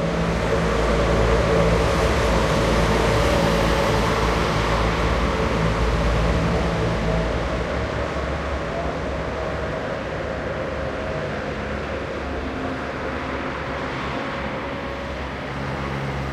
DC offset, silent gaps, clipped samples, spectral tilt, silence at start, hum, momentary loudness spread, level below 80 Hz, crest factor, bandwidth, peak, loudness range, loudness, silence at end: under 0.1%; none; under 0.1%; -6 dB/octave; 0 s; none; 8 LU; -28 dBFS; 16 dB; 13.5 kHz; -6 dBFS; 8 LU; -23 LUFS; 0 s